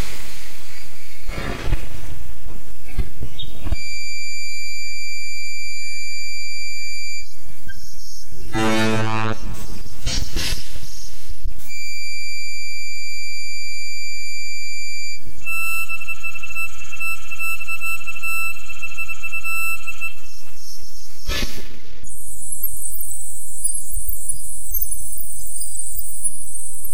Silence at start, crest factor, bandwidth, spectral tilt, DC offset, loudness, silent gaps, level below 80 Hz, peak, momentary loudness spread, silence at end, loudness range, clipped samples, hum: 0 s; 18 dB; 16 kHz; -3 dB/octave; 30%; -27 LUFS; none; -34 dBFS; -6 dBFS; 15 LU; 0 s; 5 LU; under 0.1%; none